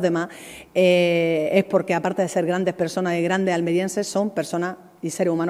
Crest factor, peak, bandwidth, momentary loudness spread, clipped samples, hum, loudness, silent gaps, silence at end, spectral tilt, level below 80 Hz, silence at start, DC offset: 18 dB; -4 dBFS; 15.5 kHz; 9 LU; under 0.1%; none; -22 LUFS; none; 0 s; -5.5 dB/octave; -68 dBFS; 0 s; under 0.1%